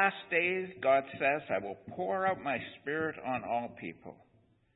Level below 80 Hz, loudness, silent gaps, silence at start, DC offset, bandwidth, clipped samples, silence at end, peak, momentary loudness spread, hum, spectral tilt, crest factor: -72 dBFS; -33 LUFS; none; 0 s; under 0.1%; 4 kHz; under 0.1%; 0.6 s; -12 dBFS; 14 LU; none; -3 dB/octave; 20 dB